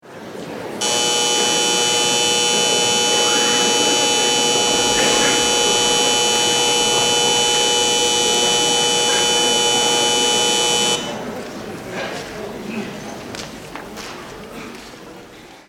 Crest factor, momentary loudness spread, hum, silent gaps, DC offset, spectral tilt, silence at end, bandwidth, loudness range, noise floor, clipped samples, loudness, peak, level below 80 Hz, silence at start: 16 dB; 17 LU; none; none; under 0.1%; -0.5 dB/octave; 0.1 s; 17 kHz; 15 LU; -40 dBFS; under 0.1%; -14 LUFS; -2 dBFS; -50 dBFS; 0.05 s